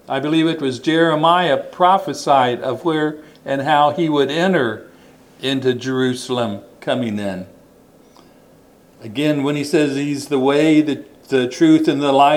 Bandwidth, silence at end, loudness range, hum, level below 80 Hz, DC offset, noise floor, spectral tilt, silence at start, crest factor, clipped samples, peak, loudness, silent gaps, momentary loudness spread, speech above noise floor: 14.5 kHz; 0 s; 8 LU; none; -64 dBFS; under 0.1%; -49 dBFS; -5.5 dB/octave; 0.1 s; 18 dB; under 0.1%; 0 dBFS; -17 LUFS; none; 11 LU; 32 dB